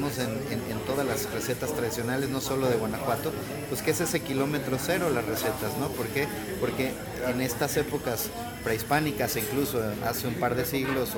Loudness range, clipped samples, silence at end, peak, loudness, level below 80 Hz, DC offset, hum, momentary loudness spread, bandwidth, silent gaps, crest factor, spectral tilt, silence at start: 1 LU; under 0.1%; 0 s; -10 dBFS; -29 LUFS; -50 dBFS; under 0.1%; none; 5 LU; 19 kHz; none; 20 dB; -4.5 dB/octave; 0 s